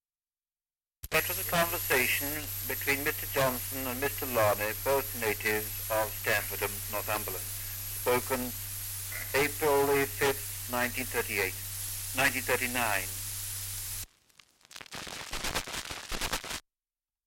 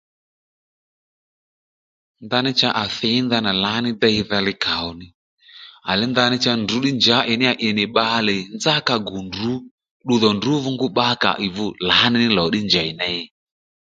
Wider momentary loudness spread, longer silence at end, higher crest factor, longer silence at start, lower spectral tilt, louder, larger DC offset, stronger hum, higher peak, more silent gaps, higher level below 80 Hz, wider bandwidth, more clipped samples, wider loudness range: about the same, 9 LU vs 9 LU; about the same, 0.65 s vs 0.6 s; about the same, 18 dB vs 20 dB; second, 1.05 s vs 2.2 s; second, -2.5 dB/octave vs -4.5 dB/octave; second, -30 LUFS vs -18 LUFS; neither; neither; second, -14 dBFS vs 0 dBFS; second, none vs 5.14-5.38 s, 9.71-9.78 s, 9.91-10.00 s; about the same, -50 dBFS vs -52 dBFS; first, 17 kHz vs 7.8 kHz; neither; first, 6 LU vs 3 LU